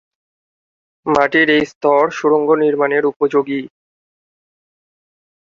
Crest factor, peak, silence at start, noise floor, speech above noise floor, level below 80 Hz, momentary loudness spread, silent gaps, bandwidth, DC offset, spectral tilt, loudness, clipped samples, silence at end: 18 dB; 0 dBFS; 1.05 s; under -90 dBFS; over 76 dB; -58 dBFS; 7 LU; 1.75-1.81 s, 3.16-3.20 s; 7.4 kHz; under 0.1%; -5.5 dB/octave; -15 LUFS; under 0.1%; 1.75 s